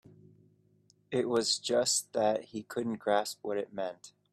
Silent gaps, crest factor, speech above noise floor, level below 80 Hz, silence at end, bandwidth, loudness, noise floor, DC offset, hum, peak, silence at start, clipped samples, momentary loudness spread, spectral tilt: none; 18 dB; 36 dB; -76 dBFS; 0.25 s; 15.5 kHz; -32 LUFS; -68 dBFS; under 0.1%; none; -14 dBFS; 1.1 s; under 0.1%; 11 LU; -2.5 dB/octave